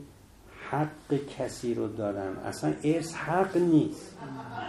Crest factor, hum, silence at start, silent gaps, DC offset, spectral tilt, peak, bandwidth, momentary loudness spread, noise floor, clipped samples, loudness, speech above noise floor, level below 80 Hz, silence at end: 18 dB; none; 0 s; none; under 0.1%; -6.5 dB/octave; -12 dBFS; 12.5 kHz; 15 LU; -53 dBFS; under 0.1%; -30 LUFS; 23 dB; -60 dBFS; 0 s